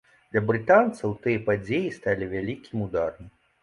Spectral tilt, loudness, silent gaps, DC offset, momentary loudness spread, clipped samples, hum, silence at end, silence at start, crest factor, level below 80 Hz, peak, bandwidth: -7.5 dB/octave; -25 LUFS; none; under 0.1%; 12 LU; under 0.1%; none; 0.35 s; 0.35 s; 18 dB; -54 dBFS; -6 dBFS; 11 kHz